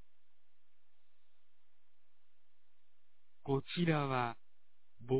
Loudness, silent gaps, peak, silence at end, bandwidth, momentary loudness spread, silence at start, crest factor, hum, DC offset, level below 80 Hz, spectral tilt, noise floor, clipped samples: -36 LUFS; none; -20 dBFS; 0 s; 4 kHz; 16 LU; 3.45 s; 22 dB; 50 Hz at -70 dBFS; 0.4%; -74 dBFS; -5.5 dB/octave; -84 dBFS; under 0.1%